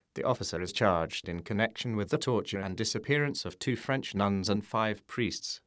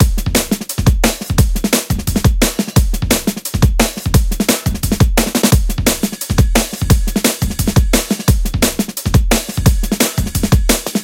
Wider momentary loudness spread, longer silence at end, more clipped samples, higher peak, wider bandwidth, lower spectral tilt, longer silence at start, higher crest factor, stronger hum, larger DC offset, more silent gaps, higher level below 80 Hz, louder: first, 6 LU vs 3 LU; about the same, 0.1 s vs 0 s; neither; second, -10 dBFS vs 0 dBFS; second, 8 kHz vs 17 kHz; about the same, -5 dB/octave vs -4.5 dB/octave; first, 0.15 s vs 0 s; first, 22 dB vs 14 dB; neither; neither; neither; second, -54 dBFS vs -18 dBFS; second, -31 LUFS vs -15 LUFS